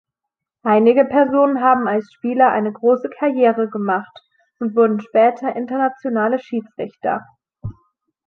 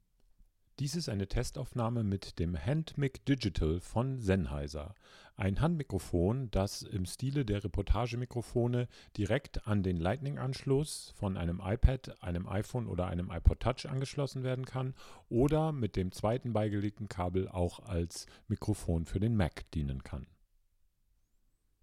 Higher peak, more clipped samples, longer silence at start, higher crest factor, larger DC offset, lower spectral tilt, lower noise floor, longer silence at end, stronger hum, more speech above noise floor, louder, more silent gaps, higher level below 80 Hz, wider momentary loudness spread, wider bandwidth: first, -2 dBFS vs -10 dBFS; neither; second, 0.65 s vs 0.8 s; second, 16 dB vs 24 dB; neither; first, -8.5 dB/octave vs -6.5 dB/octave; first, -83 dBFS vs -72 dBFS; second, 0.55 s vs 1.6 s; neither; first, 66 dB vs 39 dB; first, -17 LUFS vs -35 LUFS; neither; second, -56 dBFS vs -42 dBFS; first, 12 LU vs 8 LU; second, 4.5 kHz vs 14.5 kHz